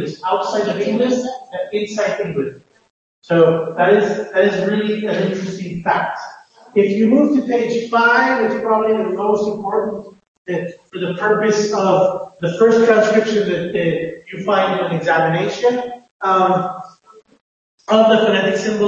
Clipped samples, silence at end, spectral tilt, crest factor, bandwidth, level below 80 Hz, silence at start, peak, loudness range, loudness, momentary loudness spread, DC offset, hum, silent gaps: under 0.1%; 0 s; -5.5 dB/octave; 16 dB; 7.8 kHz; -60 dBFS; 0 s; -2 dBFS; 3 LU; -17 LUFS; 12 LU; under 0.1%; none; 2.90-3.22 s, 10.28-10.45 s, 16.11-16.20 s, 17.41-17.78 s